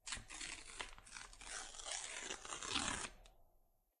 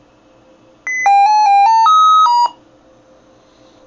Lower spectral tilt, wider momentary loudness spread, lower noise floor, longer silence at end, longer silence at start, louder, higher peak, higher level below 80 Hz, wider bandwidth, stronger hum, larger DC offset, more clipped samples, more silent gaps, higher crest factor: first, -0.5 dB/octave vs 1 dB/octave; about the same, 10 LU vs 11 LU; first, -75 dBFS vs -48 dBFS; second, 0.4 s vs 1.35 s; second, 0.05 s vs 0.85 s; second, -46 LUFS vs -10 LUFS; second, -24 dBFS vs -2 dBFS; about the same, -64 dBFS vs -64 dBFS; first, 13 kHz vs 7.6 kHz; neither; neither; neither; neither; first, 26 dB vs 10 dB